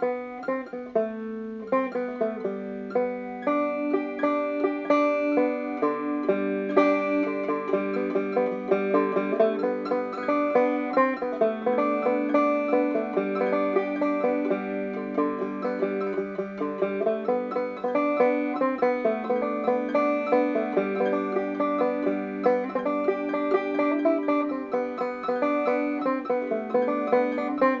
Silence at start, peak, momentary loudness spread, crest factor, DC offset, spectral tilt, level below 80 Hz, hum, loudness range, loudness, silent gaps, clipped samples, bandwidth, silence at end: 0 s; -6 dBFS; 6 LU; 20 dB; under 0.1%; -8 dB/octave; -68 dBFS; none; 3 LU; -26 LUFS; none; under 0.1%; 7 kHz; 0 s